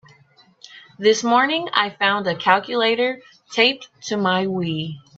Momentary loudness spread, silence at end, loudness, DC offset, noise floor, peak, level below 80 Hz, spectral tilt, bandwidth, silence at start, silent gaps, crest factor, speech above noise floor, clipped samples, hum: 10 LU; 0.2 s; -19 LUFS; under 0.1%; -54 dBFS; 0 dBFS; -66 dBFS; -4 dB/octave; 8 kHz; 0.7 s; none; 20 dB; 35 dB; under 0.1%; none